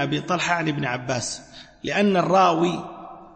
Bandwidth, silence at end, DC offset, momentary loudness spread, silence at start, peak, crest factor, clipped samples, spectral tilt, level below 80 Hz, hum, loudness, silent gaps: 8.8 kHz; 0.1 s; under 0.1%; 16 LU; 0 s; -6 dBFS; 16 dB; under 0.1%; -4.5 dB/octave; -58 dBFS; none; -22 LUFS; none